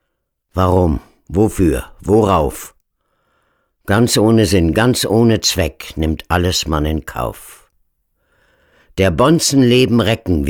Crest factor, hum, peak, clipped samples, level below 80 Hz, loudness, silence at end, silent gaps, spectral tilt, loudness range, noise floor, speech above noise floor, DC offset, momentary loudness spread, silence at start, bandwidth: 14 dB; none; -2 dBFS; under 0.1%; -32 dBFS; -15 LUFS; 0 s; none; -5 dB/octave; 6 LU; -72 dBFS; 58 dB; under 0.1%; 12 LU; 0.55 s; 19 kHz